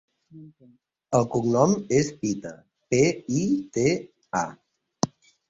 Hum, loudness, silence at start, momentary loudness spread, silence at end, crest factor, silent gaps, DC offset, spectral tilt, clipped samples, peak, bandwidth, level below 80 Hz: none; -25 LUFS; 0.35 s; 9 LU; 0.45 s; 22 dB; none; under 0.1%; -5.5 dB/octave; under 0.1%; -4 dBFS; 8 kHz; -58 dBFS